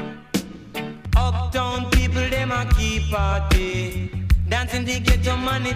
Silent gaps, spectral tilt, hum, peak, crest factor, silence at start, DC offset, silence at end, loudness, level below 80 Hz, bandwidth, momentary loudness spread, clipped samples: none; -5 dB/octave; none; -4 dBFS; 16 dB; 0 s; under 0.1%; 0 s; -22 LUFS; -24 dBFS; 15.5 kHz; 8 LU; under 0.1%